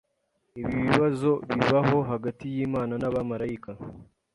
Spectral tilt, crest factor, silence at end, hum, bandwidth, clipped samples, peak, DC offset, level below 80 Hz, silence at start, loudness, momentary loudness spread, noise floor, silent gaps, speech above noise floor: -7.5 dB/octave; 24 dB; 0.3 s; none; 11.5 kHz; under 0.1%; -2 dBFS; under 0.1%; -54 dBFS; 0.55 s; -26 LUFS; 16 LU; -74 dBFS; none; 48 dB